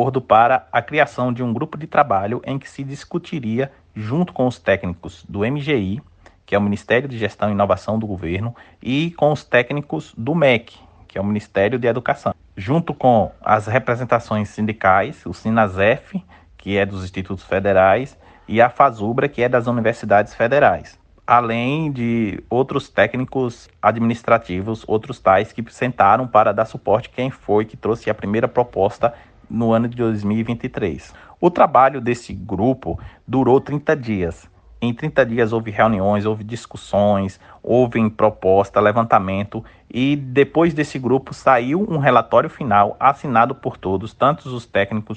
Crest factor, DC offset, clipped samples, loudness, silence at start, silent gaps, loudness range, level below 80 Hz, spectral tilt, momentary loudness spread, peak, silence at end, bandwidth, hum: 18 dB; under 0.1%; under 0.1%; -19 LUFS; 0 s; none; 4 LU; -48 dBFS; -7.5 dB/octave; 12 LU; 0 dBFS; 0 s; 9.2 kHz; none